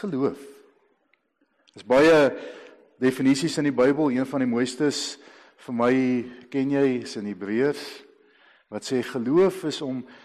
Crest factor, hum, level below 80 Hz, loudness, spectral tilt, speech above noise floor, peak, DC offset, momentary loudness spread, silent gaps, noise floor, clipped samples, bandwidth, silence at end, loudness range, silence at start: 14 dB; none; -64 dBFS; -23 LUFS; -5.5 dB/octave; 46 dB; -12 dBFS; under 0.1%; 15 LU; none; -69 dBFS; under 0.1%; 13 kHz; 0.1 s; 5 LU; 0 s